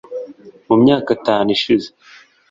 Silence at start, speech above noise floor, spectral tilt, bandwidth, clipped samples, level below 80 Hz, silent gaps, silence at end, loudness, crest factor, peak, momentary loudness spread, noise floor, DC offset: 0.1 s; 21 dB; -6.5 dB/octave; 7.6 kHz; under 0.1%; -54 dBFS; none; 0.65 s; -15 LUFS; 16 dB; -2 dBFS; 19 LU; -36 dBFS; under 0.1%